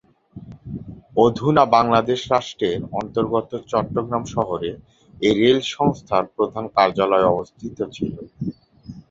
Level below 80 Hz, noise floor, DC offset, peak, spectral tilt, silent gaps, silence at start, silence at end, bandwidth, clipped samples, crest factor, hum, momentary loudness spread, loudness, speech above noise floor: -50 dBFS; -41 dBFS; under 0.1%; 0 dBFS; -6 dB/octave; none; 0.35 s; 0.1 s; 7.8 kHz; under 0.1%; 20 dB; none; 15 LU; -20 LUFS; 21 dB